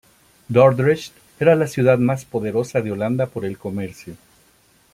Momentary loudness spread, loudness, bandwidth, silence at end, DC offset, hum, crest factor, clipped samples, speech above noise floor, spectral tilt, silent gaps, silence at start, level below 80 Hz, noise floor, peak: 15 LU; -19 LUFS; 15.5 kHz; 0.8 s; under 0.1%; none; 18 dB; under 0.1%; 38 dB; -7.5 dB/octave; none; 0.5 s; -58 dBFS; -57 dBFS; -2 dBFS